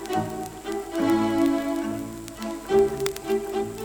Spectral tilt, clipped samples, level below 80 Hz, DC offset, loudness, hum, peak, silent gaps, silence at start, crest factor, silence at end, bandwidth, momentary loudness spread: -5.5 dB/octave; under 0.1%; -50 dBFS; under 0.1%; -26 LUFS; none; -6 dBFS; none; 0 s; 20 dB; 0 s; over 20 kHz; 12 LU